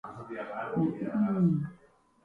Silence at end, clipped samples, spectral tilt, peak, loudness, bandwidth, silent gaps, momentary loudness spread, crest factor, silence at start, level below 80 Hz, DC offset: 0.5 s; under 0.1%; -10.5 dB/octave; -16 dBFS; -30 LUFS; 3.7 kHz; none; 14 LU; 16 dB; 0.05 s; -66 dBFS; under 0.1%